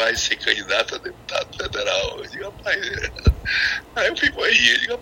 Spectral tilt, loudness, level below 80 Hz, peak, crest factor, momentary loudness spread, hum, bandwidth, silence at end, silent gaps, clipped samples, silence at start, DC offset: -2.5 dB/octave; -20 LUFS; -32 dBFS; 0 dBFS; 22 dB; 12 LU; none; 16.5 kHz; 0 s; none; under 0.1%; 0 s; under 0.1%